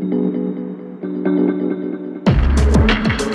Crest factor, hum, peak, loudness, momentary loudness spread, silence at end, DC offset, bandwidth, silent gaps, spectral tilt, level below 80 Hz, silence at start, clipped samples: 14 dB; none; -2 dBFS; -18 LUFS; 12 LU; 0 s; under 0.1%; 11 kHz; none; -6.5 dB/octave; -22 dBFS; 0 s; under 0.1%